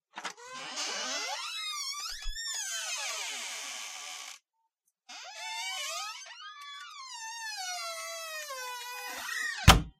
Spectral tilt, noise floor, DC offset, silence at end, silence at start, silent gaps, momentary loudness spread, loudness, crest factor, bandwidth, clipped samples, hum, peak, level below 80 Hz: -2.5 dB/octave; -79 dBFS; under 0.1%; 0.1 s; 0.15 s; none; 11 LU; -34 LUFS; 30 dB; 15.5 kHz; under 0.1%; none; -4 dBFS; -42 dBFS